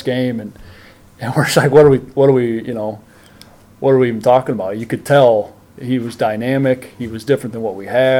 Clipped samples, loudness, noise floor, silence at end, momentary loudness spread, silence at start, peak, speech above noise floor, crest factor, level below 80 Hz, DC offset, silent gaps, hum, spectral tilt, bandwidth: under 0.1%; -15 LUFS; -43 dBFS; 0 s; 15 LU; 0 s; 0 dBFS; 29 dB; 16 dB; -50 dBFS; under 0.1%; none; none; -6.5 dB/octave; 16.5 kHz